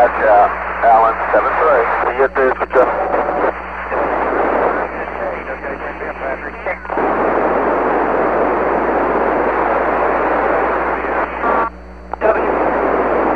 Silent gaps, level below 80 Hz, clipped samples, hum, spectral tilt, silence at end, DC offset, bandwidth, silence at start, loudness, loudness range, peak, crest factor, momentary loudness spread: none; -38 dBFS; under 0.1%; none; -7.5 dB/octave; 0 s; 0.7%; 6.4 kHz; 0 s; -16 LUFS; 5 LU; 0 dBFS; 16 dB; 11 LU